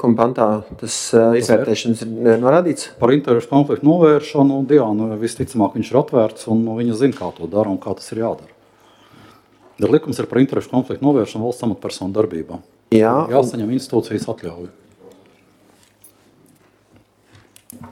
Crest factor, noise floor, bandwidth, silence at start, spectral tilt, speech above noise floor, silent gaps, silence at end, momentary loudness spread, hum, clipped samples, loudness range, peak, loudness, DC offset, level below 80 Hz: 18 dB; -54 dBFS; 15 kHz; 0 s; -6.5 dB/octave; 37 dB; none; 0 s; 11 LU; none; under 0.1%; 8 LU; 0 dBFS; -17 LUFS; under 0.1%; -56 dBFS